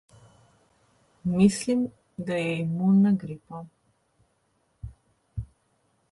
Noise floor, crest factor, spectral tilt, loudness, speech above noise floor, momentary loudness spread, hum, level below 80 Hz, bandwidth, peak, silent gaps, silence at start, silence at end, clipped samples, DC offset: -70 dBFS; 20 dB; -7 dB/octave; -25 LUFS; 47 dB; 24 LU; none; -54 dBFS; 11.5 kHz; -8 dBFS; none; 1.25 s; 0.7 s; under 0.1%; under 0.1%